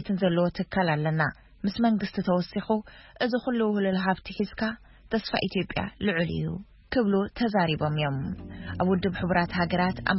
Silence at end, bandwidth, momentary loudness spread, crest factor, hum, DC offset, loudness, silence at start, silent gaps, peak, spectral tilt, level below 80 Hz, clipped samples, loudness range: 0 s; 5.8 kHz; 7 LU; 20 dB; none; under 0.1%; -27 LUFS; 0 s; none; -8 dBFS; -10.5 dB/octave; -50 dBFS; under 0.1%; 2 LU